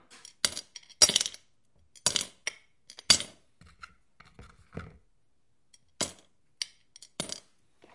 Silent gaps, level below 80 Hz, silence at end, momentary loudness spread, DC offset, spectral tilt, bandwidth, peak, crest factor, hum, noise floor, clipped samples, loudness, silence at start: none; -64 dBFS; 0.55 s; 25 LU; under 0.1%; 0 dB/octave; 11.5 kHz; -4 dBFS; 30 dB; none; -77 dBFS; under 0.1%; -28 LUFS; 0.45 s